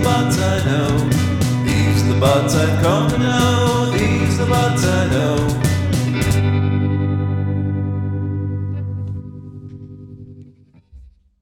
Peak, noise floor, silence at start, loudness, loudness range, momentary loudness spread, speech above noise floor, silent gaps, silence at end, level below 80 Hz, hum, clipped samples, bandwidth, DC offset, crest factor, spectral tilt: -2 dBFS; -47 dBFS; 0 s; -17 LUFS; 9 LU; 15 LU; 33 dB; none; 0.35 s; -36 dBFS; none; under 0.1%; 16.5 kHz; under 0.1%; 16 dB; -6 dB/octave